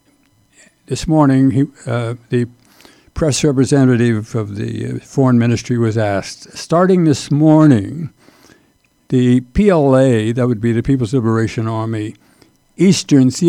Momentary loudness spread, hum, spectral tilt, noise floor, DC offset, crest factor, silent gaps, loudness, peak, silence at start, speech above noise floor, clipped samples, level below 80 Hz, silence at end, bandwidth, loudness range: 12 LU; none; -6.5 dB/octave; -57 dBFS; under 0.1%; 14 dB; none; -15 LUFS; 0 dBFS; 0.9 s; 43 dB; under 0.1%; -40 dBFS; 0 s; 12.5 kHz; 3 LU